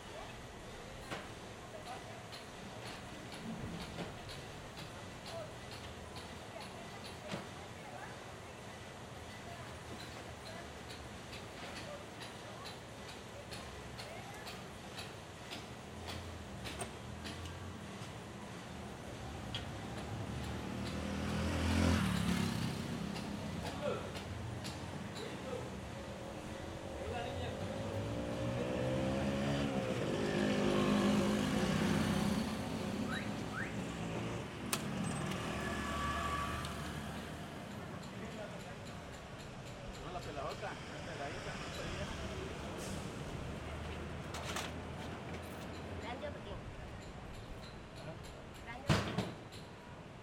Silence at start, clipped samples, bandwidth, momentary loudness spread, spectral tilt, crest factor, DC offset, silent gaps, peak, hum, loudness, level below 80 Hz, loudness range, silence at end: 0 s; under 0.1%; 16 kHz; 14 LU; -5 dB/octave; 24 dB; under 0.1%; none; -16 dBFS; none; -42 LUFS; -56 dBFS; 12 LU; 0 s